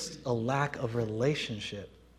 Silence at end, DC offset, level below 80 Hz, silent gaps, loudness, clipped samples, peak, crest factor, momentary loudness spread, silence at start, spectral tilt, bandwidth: 0.3 s; under 0.1%; -60 dBFS; none; -32 LUFS; under 0.1%; -14 dBFS; 20 dB; 9 LU; 0 s; -5.5 dB/octave; 13.5 kHz